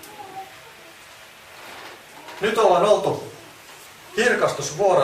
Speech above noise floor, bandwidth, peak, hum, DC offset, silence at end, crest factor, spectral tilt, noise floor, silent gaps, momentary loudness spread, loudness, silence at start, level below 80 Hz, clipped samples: 26 dB; 15.5 kHz; -4 dBFS; none; under 0.1%; 0 s; 20 dB; -3.5 dB/octave; -45 dBFS; none; 25 LU; -20 LUFS; 0.05 s; -62 dBFS; under 0.1%